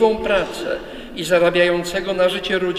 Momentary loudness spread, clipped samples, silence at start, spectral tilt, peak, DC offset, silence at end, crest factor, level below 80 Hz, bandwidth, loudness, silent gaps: 12 LU; under 0.1%; 0 s; -4.5 dB/octave; -4 dBFS; under 0.1%; 0 s; 16 dB; -42 dBFS; 15 kHz; -19 LUFS; none